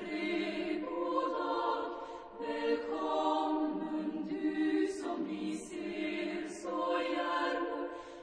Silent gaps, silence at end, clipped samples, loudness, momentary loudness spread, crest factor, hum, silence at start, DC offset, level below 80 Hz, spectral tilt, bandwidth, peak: none; 0 s; under 0.1%; -35 LUFS; 8 LU; 16 dB; none; 0 s; under 0.1%; -70 dBFS; -4.5 dB/octave; 10 kHz; -20 dBFS